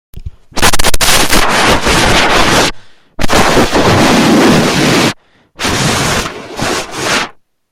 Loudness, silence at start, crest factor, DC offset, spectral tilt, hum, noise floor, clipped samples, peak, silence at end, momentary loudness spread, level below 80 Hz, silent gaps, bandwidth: -10 LUFS; 0.15 s; 10 dB; under 0.1%; -3.5 dB/octave; none; -33 dBFS; 0.4%; 0 dBFS; 0.4 s; 9 LU; -22 dBFS; none; 19.5 kHz